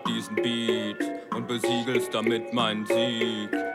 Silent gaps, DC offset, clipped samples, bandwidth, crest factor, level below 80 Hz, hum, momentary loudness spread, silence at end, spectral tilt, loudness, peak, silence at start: none; under 0.1%; under 0.1%; 15.5 kHz; 16 dB; -72 dBFS; none; 6 LU; 0 s; -4.5 dB/octave; -27 LUFS; -10 dBFS; 0 s